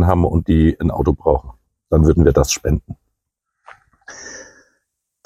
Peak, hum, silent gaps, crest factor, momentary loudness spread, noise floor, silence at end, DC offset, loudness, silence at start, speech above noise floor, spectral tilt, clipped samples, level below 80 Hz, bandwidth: 0 dBFS; none; none; 18 dB; 23 LU; -77 dBFS; 0.85 s; under 0.1%; -16 LUFS; 0 s; 62 dB; -6.5 dB/octave; under 0.1%; -26 dBFS; 15 kHz